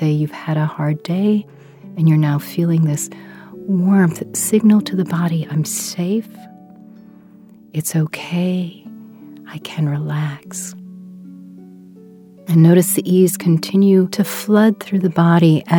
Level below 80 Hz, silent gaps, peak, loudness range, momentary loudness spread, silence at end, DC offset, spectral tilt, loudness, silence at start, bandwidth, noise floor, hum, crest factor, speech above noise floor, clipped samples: -66 dBFS; none; 0 dBFS; 10 LU; 20 LU; 0 s; under 0.1%; -6.5 dB/octave; -17 LUFS; 0 s; 19 kHz; -44 dBFS; none; 16 dB; 28 dB; under 0.1%